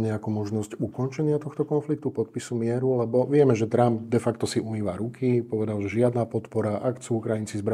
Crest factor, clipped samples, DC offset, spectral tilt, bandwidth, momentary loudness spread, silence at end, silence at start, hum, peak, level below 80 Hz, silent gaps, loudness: 18 dB; under 0.1%; under 0.1%; -7.5 dB/octave; 13 kHz; 8 LU; 0 s; 0 s; none; -6 dBFS; -66 dBFS; none; -26 LUFS